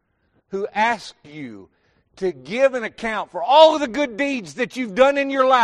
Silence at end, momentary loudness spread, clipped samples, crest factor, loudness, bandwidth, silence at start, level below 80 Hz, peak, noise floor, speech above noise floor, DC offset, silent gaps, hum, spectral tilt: 0 s; 20 LU; under 0.1%; 18 dB; -19 LUFS; 11 kHz; 0.5 s; -58 dBFS; -2 dBFS; -65 dBFS; 46 dB; under 0.1%; none; none; -4 dB/octave